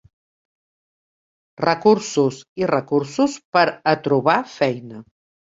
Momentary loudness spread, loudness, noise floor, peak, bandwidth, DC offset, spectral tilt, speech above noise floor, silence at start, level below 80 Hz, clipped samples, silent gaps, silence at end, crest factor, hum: 6 LU; -19 LUFS; under -90 dBFS; -2 dBFS; 7.8 kHz; under 0.1%; -5.5 dB/octave; over 71 dB; 1.6 s; -62 dBFS; under 0.1%; 2.48-2.56 s, 3.45-3.53 s; 0.55 s; 20 dB; none